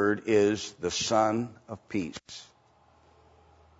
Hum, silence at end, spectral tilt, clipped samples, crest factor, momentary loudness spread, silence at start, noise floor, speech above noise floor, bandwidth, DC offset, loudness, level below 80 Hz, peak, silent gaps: none; 1.35 s; -4 dB/octave; under 0.1%; 20 dB; 20 LU; 0 s; -62 dBFS; 34 dB; 8 kHz; under 0.1%; -28 LUFS; -64 dBFS; -12 dBFS; none